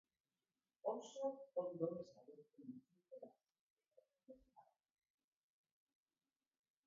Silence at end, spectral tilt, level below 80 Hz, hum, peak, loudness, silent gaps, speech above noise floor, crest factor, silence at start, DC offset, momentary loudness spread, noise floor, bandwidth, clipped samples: 2.25 s; -8 dB/octave; under -90 dBFS; none; -30 dBFS; -48 LUFS; 3.59-3.76 s; over 43 dB; 24 dB; 0.85 s; under 0.1%; 20 LU; under -90 dBFS; 7 kHz; under 0.1%